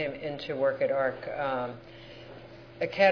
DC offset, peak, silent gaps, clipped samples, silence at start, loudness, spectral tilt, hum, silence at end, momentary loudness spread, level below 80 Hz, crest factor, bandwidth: under 0.1%; -10 dBFS; none; under 0.1%; 0 s; -30 LUFS; -6.5 dB/octave; none; 0 s; 20 LU; -60 dBFS; 20 dB; 5.4 kHz